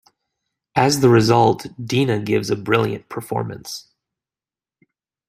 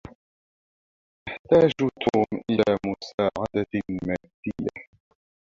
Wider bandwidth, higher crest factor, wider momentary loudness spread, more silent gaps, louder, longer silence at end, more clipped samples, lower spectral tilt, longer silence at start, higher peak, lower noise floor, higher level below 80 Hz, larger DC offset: first, 15.5 kHz vs 7.4 kHz; about the same, 18 dB vs 20 dB; about the same, 16 LU vs 16 LU; second, none vs 0.15-1.26 s, 1.39-1.45 s, 3.14-3.18 s, 4.34-4.43 s; first, -18 LUFS vs -25 LUFS; first, 1.5 s vs 0.65 s; neither; second, -5.5 dB/octave vs -7 dB/octave; first, 0.75 s vs 0.05 s; first, -2 dBFS vs -6 dBFS; about the same, under -90 dBFS vs under -90 dBFS; about the same, -56 dBFS vs -54 dBFS; neither